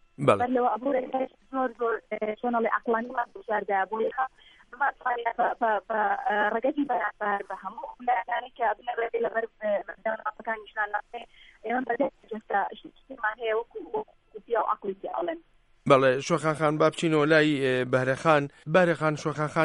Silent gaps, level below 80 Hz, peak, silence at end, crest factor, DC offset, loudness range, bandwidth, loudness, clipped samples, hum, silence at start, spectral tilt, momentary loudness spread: none; -64 dBFS; -6 dBFS; 0 s; 22 dB; under 0.1%; 8 LU; 11.5 kHz; -27 LUFS; under 0.1%; none; 0.2 s; -6 dB/octave; 11 LU